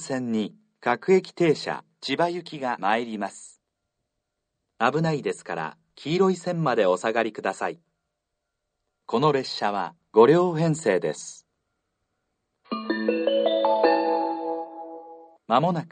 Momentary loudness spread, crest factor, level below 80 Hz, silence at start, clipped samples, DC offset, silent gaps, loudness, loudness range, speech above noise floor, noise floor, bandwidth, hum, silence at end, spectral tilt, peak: 14 LU; 22 dB; -72 dBFS; 0 s; under 0.1%; under 0.1%; none; -24 LUFS; 5 LU; 57 dB; -81 dBFS; 9.4 kHz; none; 0.05 s; -5.5 dB/octave; -4 dBFS